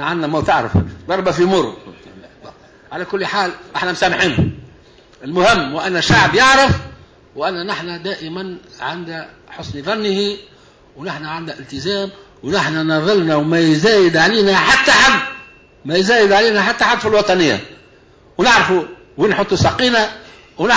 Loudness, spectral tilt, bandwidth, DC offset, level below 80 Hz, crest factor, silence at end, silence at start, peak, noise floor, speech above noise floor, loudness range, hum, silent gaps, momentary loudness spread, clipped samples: -14 LUFS; -4.5 dB/octave; 8 kHz; under 0.1%; -38 dBFS; 14 dB; 0 s; 0 s; -2 dBFS; -47 dBFS; 32 dB; 11 LU; none; none; 17 LU; under 0.1%